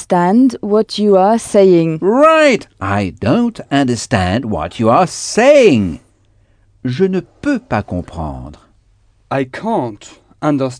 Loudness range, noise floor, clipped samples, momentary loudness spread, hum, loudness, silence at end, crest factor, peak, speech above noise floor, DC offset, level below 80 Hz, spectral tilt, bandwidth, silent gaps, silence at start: 9 LU; -52 dBFS; under 0.1%; 14 LU; none; -13 LUFS; 0 s; 14 dB; 0 dBFS; 39 dB; under 0.1%; -42 dBFS; -6 dB/octave; 10 kHz; none; 0 s